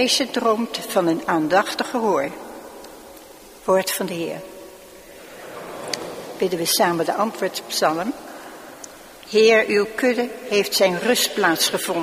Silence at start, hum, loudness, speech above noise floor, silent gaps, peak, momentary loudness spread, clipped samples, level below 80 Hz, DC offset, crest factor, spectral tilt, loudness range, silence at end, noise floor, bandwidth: 0 s; none; -20 LUFS; 23 dB; none; -2 dBFS; 21 LU; under 0.1%; -60 dBFS; under 0.1%; 20 dB; -3 dB/octave; 8 LU; 0 s; -43 dBFS; 15.5 kHz